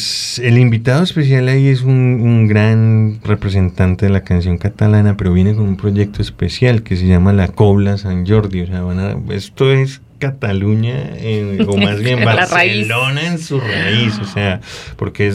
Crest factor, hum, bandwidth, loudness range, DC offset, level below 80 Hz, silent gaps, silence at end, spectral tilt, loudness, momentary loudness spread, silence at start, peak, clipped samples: 12 dB; none; 12 kHz; 4 LU; under 0.1%; -36 dBFS; none; 0 s; -6.5 dB/octave; -14 LUFS; 8 LU; 0 s; 0 dBFS; under 0.1%